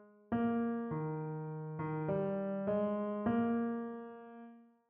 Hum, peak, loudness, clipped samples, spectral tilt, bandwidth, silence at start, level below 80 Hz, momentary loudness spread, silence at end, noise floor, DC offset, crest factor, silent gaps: none; -22 dBFS; -37 LUFS; under 0.1%; -8.5 dB/octave; 3.5 kHz; 0 s; -70 dBFS; 15 LU; 0.25 s; -57 dBFS; under 0.1%; 14 dB; none